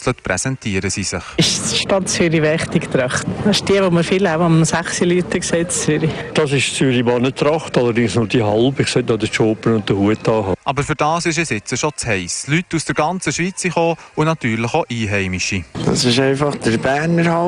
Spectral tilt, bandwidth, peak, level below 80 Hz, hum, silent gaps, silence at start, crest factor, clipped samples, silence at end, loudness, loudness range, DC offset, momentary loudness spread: -4.5 dB/octave; 13 kHz; -4 dBFS; -44 dBFS; none; none; 0 s; 14 dB; under 0.1%; 0 s; -17 LUFS; 3 LU; under 0.1%; 5 LU